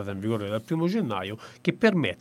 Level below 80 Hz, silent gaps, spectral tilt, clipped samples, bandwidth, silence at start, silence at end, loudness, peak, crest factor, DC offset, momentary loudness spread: -68 dBFS; none; -7 dB/octave; under 0.1%; 15 kHz; 0 s; 0.05 s; -27 LUFS; -6 dBFS; 20 dB; under 0.1%; 8 LU